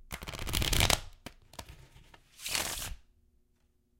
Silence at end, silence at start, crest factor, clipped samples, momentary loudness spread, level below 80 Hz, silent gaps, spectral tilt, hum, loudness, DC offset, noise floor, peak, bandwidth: 1.05 s; 0.05 s; 30 dB; under 0.1%; 23 LU; -42 dBFS; none; -2 dB/octave; none; -32 LUFS; under 0.1%; -71 dBFS; -6 dBFS; 16.5 kHz